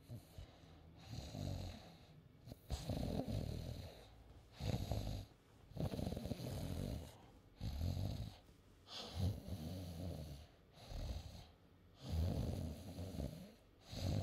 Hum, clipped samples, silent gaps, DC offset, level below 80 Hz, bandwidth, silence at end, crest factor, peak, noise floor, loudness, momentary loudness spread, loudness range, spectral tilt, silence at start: none; under 0.1%; none; under 0.1%; -54 dBFS; 16 kHz; 0 s; 20 dB; -26 dBFS; -66 dBFS; -47 LUFS; 19 LU; 2 LU; -6.5 dB/octave; 0 s